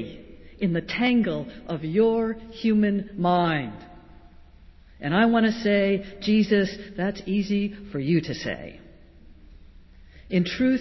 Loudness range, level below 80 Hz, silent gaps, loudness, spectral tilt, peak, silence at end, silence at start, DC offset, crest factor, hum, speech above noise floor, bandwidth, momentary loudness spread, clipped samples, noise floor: 6 LU; -50 dBFS; none; -24 LUFS; -7 dB/octave; -10 dBFS; 0 s; 0 s; under 0.1%; 16 dB; none; 26 dB; 6.2 kHz; 12 LU; under 0.1%; -50 dBFS